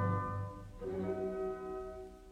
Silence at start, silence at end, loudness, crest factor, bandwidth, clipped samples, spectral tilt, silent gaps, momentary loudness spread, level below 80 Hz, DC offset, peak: 0 s; 0 s; -40 LUFS; 16 dB; 9.6 kHz; under 0.1%; -9 dB/octave; none; 9 LU; -56 dBFS; under 0.1%; -22 dBFS